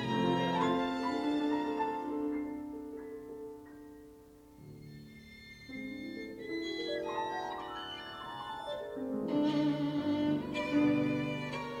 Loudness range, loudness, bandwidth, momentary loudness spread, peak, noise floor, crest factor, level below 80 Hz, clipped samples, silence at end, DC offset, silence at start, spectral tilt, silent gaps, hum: 14 LU; -35 LUFS; 12 kHz; 20 LU; -18 dBFS; -56 dBFS; 16 dB; -66 dBFS; under 0.1%; 0 s; under 0.1%; 0 s; -6.5 dB/octave; none; none